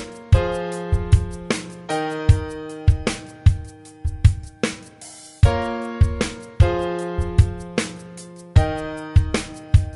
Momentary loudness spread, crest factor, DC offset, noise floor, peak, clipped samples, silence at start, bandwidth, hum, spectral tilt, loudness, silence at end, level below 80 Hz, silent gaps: 12 LU; 18 dB; under 0.1%; -42 dBFS; -2 dBFS; under 0.1%; 0 s; 11.5 kHz; none; -6.5 dB/octave; -22 LUFS; 0 s; -26 dBFS; none